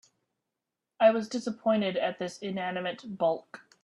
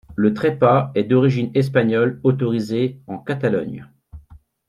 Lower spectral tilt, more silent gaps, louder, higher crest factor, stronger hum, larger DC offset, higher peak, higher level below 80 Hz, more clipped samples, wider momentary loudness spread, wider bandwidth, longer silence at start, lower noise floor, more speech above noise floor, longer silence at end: second, -5.5 dB/octave vs -8.5 dB/octave; neither; second, -29 LUFS vs -19 LUFS; about the same, 20 dB vs 18 dB; neither; neither; second, -10 dBFS vs -2 dBFS; second, -76 dBFS vs -52 dBFS; neither; about the same, 11 LU vs 9 LU; about the same, 11 kHz vs 11 kHz; first, 1 s vs 0.1 s; first, -87 dBFS vs -47 dBFS; first, 58 dB vs 29 dB; about the same, 0.25 s vs 0.35 s